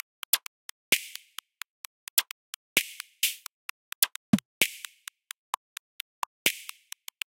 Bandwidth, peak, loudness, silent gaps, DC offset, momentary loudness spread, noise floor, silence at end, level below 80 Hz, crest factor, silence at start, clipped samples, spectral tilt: 17 kHz; -4 dBFS; -29 LUFS; 0.47-0.92 s, 1.70-2.17 s, 2.31-2.76 s, 3.53-4.02 s, 4.16-4.33 s, 4.45-4.61 s, 5.38-6.45 s; under 0.1%; 17 LU; -48 dBFS; 0.7 s; -74 dBFS; 30 dB; 0.35 s; under 0.1%; -1.5 dB/octave